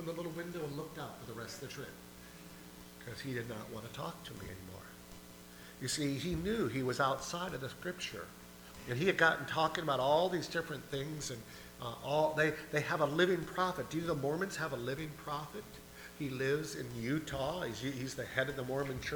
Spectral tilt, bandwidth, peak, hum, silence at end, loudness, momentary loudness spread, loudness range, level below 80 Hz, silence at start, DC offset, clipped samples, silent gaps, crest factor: -4.5 dB/octave; over 20 kHz; -14 dBFS; 60 Hz at -60 dBFS; 0 s; -37 LUFS; 20 LU; 11 LU; -60 dBFS; 0 s; under 0.1%; under 0.1%; none; 22 dB